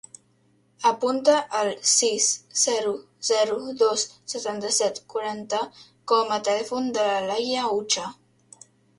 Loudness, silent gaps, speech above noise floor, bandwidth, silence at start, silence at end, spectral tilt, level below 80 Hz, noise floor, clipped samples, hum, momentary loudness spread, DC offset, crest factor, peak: -23 LUFS; none; 39 dB; 11.5 kHz; 0.8 s; 0.85 s; -1 dB/octave; -72 dBFS; -63 dBFS; under 0.1%; none; 10 LU; under 0.1%; 20 dB; -6 dBFS